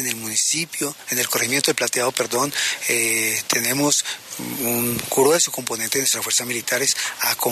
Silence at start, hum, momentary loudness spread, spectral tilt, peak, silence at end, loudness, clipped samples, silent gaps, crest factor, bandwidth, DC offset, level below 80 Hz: 0 s; none; 5 LU; -1.5 dB/octave; 0 dBFS; 0 s; -20 LUFS; under 0.1%; none; 22 dB; 14.5 kHz; under 0.1%; -62 dBFS